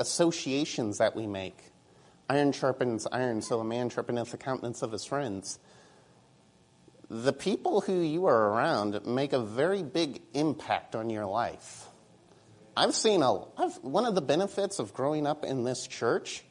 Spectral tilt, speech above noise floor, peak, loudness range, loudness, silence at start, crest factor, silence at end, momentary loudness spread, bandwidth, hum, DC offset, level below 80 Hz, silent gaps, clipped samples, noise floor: -4.5 dB/octave; 32 dB; -10 dBFS; 6 LU; -30 LUFS; 0 s; 20 dB; 0.1 s; 10 LU; 11 kHz; none; under 0.1%; -72 dBFS; none; under 0.1%; -62 dBFS